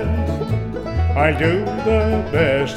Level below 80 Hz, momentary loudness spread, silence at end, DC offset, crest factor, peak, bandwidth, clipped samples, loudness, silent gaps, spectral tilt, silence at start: -28 dBFS; 6 LU; 0 s; under 0.1%; 16 dB; -2 dBFS; 10 kHz; under 0.1%; -19 LUFS; none; -7.5 dB/octave; 0 s